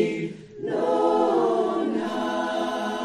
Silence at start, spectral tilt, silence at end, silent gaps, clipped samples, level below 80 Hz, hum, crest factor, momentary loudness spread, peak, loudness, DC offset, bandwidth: 0 s; -5.5 dB/octave; 0 s; none; under 0.1%; -64 dBFS; none; 14 dB; 10 LU; -10 dBFS; -24 LUFS; under 0.1%; 12.5 kHz